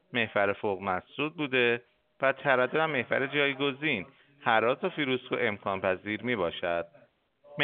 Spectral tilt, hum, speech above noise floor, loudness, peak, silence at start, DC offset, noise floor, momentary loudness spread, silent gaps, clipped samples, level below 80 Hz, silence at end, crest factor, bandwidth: -2.5 dB/octave; none; 33 dB; -29 LUFS; -8 dBFS; 0.1 s; under 0.1%; -62 dBFS; 8 LU; none; under 0.1%; -70 dBFS; 0 s; 22 dB; 4.7 kHz